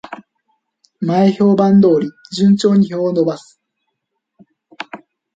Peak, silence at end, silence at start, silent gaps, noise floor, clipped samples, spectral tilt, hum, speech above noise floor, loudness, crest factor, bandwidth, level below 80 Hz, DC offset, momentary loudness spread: -2 dBFS; 0.4 s; 0.1 s; none; -74 dBFS; under 0.1%; -7.5 dB/octave; none; 61 dB; -14 LUFS; 14 dB; 7.8 kHz; -60 dBFS; under 0.1%; 21 LU